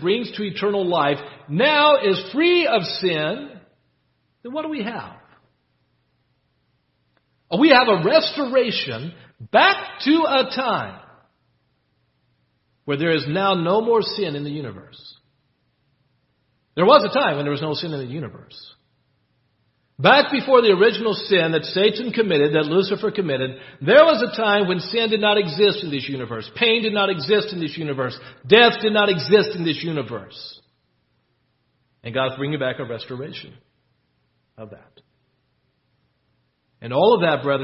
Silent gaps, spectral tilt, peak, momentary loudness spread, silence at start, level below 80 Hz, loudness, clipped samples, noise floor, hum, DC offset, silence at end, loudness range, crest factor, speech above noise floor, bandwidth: none; -8.5 dB/octave; 0 dBFS; 18 LU; 0 s; -64 dBFS; -19 LUFS; under 0.1%; -68 dBFS; none; under 0.1%; 0 s; 11 LU; 20 dB; 49 dB; 5.8 kHz